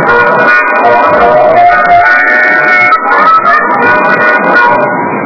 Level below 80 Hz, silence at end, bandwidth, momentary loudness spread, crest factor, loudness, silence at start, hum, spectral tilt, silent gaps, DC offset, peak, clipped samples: -40 dBFS; 0 s; 5.4 kHz; 2 LU; 6 dB; -5 LUFS; 0 s; none; -6 dB/octave; none; 0.9%; 0 dBFS; 7%